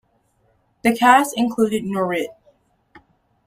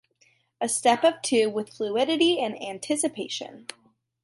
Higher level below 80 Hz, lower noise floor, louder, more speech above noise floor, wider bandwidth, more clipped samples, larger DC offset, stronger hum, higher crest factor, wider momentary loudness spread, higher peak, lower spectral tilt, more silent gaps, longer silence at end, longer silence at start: first, -60 dBFS vs -78 dBFS; about the same, -63 dBFS vs -65 dBFS; first, -18 LUFS vs -25 LUFS; first, 45 dB vs 40 dB; first, 16 kHz vs 12 kHz; neither; neither; neither; about the same, 20 dB vs 20 dB; second, 10 LU vs 13 LU; first, -2 dBFS vs -8 dBFS; first, -4.5 dB/octave vs -2.5 dB/octave; neither; first, 1.15 s vs 0.6 s; first, 0.85 s vs 0.6 s